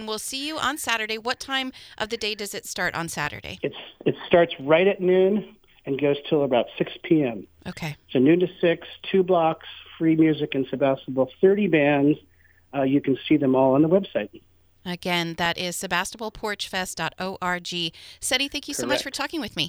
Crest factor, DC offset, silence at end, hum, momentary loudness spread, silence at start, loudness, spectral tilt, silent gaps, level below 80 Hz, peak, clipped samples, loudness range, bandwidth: 20 dB; under 0.1%; 0 s; none; 12 LU; 0 s; -24 LUFS; -4.5 dB/octave; none; -58 dBFS; -4 dBFS; under 0.1%; 5 LU; over 20 kHz